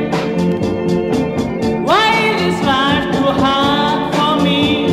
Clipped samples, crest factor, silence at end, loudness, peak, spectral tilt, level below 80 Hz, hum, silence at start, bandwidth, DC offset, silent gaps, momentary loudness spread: under 0.1%; 12 dB; 0 s; -14 LUFS; -2 dBFS; -5.5 dB/octave; -40 dBFS; none; 0 s; 14.5 kHz; under 0.1%; none; 5 LU